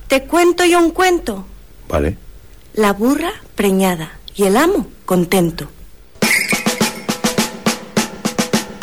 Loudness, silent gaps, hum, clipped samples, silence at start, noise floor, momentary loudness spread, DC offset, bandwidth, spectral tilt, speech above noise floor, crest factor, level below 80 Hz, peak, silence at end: -16 LUFS; none; none; under 0.1%; 0 s; -39 dBFS; 11 LU; 0.7%; 19 kHz; -4 dB/octave; 24 dB; 12 dB; -36 dBFS; -6 dBFS; 0 s